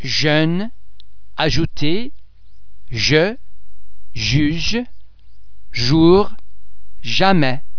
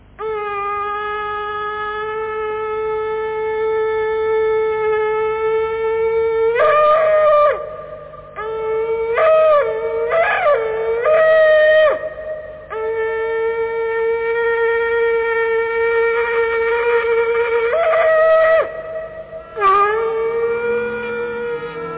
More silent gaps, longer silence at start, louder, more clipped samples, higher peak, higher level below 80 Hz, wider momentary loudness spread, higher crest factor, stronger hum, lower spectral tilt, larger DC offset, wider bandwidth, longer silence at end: neither; second, 0 s vs 0.2 s; about the same, -17 LUFS vs -17 LUFS; neither; first, 0 dBFS vs -4 dBFS; first, -36 dBFS vs -48 dBFS; first, 19 LU vs 12 LU; first, 18 dB vs 12 dB; second, none vs 50 Hz at -50 dBFS; second, -5.5 dB/octave vs -7 dB/octave; first, 7% vs under 0.1%; first, 5.4 kHz vs 4 kHz; about the same, 0 s vs 0 s